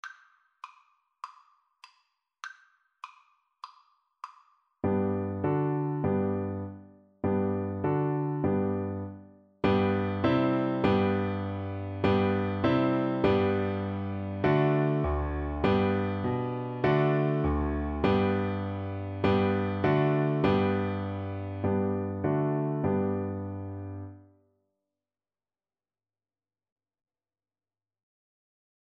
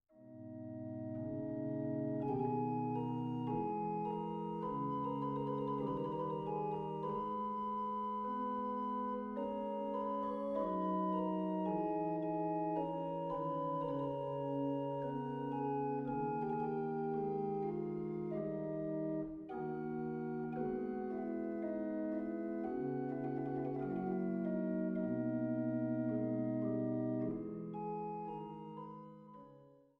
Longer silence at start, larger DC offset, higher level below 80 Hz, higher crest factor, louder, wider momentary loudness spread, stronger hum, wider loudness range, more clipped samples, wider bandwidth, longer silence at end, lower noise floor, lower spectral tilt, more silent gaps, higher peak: about the same, 0.05 s vs 0.15 s; neither; first, -46 dBFS vs -70 dBFS; about the same, 18 dB vs 14 dB; first, -29 LUFS vs -40 LUFS; first, 20 LU vs 6 LU; neither; first, 7 LU vs 3 LU; neither; first, 6.6 kHz vs 5.2 kHz; first, 4.7 s vs 0.25 s; first, under -90 dBFS vs -62 dBFS; second, -9 dB/octave vs -10.5 dB/octave; neither; first, -12 dBFS vs -24 dBFS